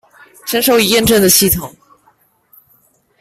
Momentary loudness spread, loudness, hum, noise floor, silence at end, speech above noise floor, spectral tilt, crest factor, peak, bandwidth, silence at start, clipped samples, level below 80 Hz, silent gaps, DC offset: 15 LU; -11 LUFS; none; -55 dBFS; 1.5 s; 43 dB; -3 dB/octave; 16 dB; 0 dBFS; 16.5 kHz; 0.45 s; under 0.1%; -40 dBFS; none; under 0.1%